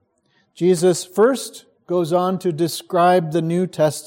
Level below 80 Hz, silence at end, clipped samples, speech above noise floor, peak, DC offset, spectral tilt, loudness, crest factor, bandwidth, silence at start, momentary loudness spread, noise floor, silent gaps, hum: -68 dBFS; 0 s; under 0.1%; 45 dB; -4 dBFS; under 0.1%; -5.5 dB/octave; -19 LUFS; 14 dB; 16.5 kHz; 0.6 s; 7 LU; -63 dBFS; none; none